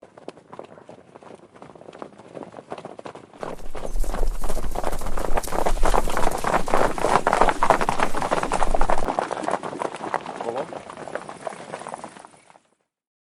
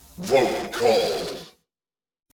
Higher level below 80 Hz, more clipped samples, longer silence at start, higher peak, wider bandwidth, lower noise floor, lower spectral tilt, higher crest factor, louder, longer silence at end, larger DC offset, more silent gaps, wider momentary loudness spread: first, -30 dBFS vs -56 dBFS; neither; first, 0.5 s vs 0.15 s; first, 0 dBFS vs -6 dBFS; second, 13 kHz vs over 20 kHz; second, -68 dBFS vs under -90 dBFS; about the same, -4.5 dB/octave vs -4 dB/octave; about the same, 22 dB vs 18 dB; second, -25 LUFS vs -22 LUFS; first, 1.2 s vs 0.85 s; neither; neither; first, 23 LU vs 12 LU